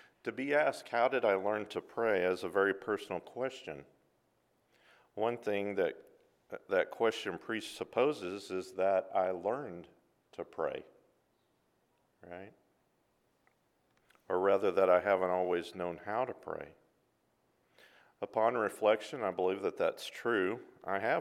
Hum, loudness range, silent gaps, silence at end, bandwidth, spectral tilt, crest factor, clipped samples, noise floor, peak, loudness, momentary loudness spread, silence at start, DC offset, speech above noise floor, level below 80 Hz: none; 8 LU; none; 0 s; 14.5 kHz; -5 dB/octave; 22 dB; under 0.1%; -75 dBFS; -14 dBFS; -34 LUFS; 17 LU; 0.25 s; under 0.1%; 42 dB; -78 dBFS